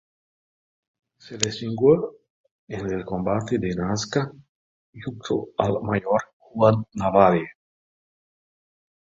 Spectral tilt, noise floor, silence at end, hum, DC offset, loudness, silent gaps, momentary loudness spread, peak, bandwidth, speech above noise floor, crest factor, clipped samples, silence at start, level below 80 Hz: -5.5 dB/octave; under -90 dBFS; 1.65 s; none; under 0.1%; -23 LUFS; 2.30-2.44 s, 2.51-2.67 s, 4.49-4.93 s, 6.33-6.40 s; 16 LU; -2 dBFS; 7.8 kHz; over 68 dB; 24 dB; under 0.1%; 1.25 s; -52 dBFS